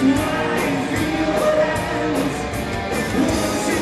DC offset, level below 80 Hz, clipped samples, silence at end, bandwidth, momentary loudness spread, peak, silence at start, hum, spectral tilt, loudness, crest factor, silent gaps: under 0.1%; -38 dBFS; under 0.1%; 0 s; 14 kHz; 5 LU; -6 dBFS; 0 s; none; -5 dB/octave; -20 LUFS; 14 dB; none